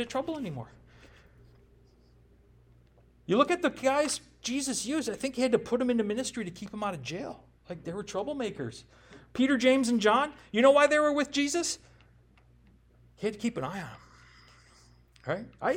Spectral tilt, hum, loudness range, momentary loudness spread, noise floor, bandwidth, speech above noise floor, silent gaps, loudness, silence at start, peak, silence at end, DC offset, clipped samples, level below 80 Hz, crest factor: -4 dB/octave; 60 Hz at -60 dBFS; 13 LU; 17 LU; -60 dBFS; 16.5 kHz; 32 dB; none; -29 LUFS; 0 s; -10 dBFS; 0 s; under 0.1%; under 0.1%; -62 dBFS; 22 dB